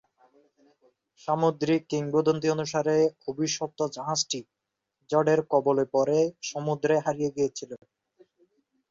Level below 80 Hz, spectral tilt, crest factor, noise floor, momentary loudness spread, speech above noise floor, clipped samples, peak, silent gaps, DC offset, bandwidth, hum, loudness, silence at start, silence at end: -70 dBFS; -5 dB/octave; 18 dB; -79 dBFS; 8 LU; 53 dB; under 0.1%; -10 dBFS; none; under 0.1%; 7.8 kHz; none; -26 LUFS; 1.25 s; 1.15 s